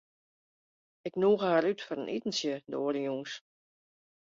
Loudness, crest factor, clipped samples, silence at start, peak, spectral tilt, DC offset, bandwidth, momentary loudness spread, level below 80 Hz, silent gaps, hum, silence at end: -31 LUFS; 20 dB; under 0.1%; 1.05 s; -14 dBFS; -4.5 dB/octave; under 0.1%; 7.6 kHz; 14 LU; -78 dBFS; none; none; 0.9 s